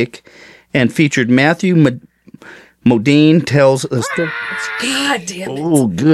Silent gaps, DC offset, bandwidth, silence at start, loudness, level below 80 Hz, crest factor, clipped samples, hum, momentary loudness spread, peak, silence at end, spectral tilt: none; under 0.1%; 13.5 kHz; 0 s; -14 LUFS; -54 dBFS; 14 dB; under 0.1%; none; 10 LU; 0 dBFS; 0 s; -5.5 dB/octave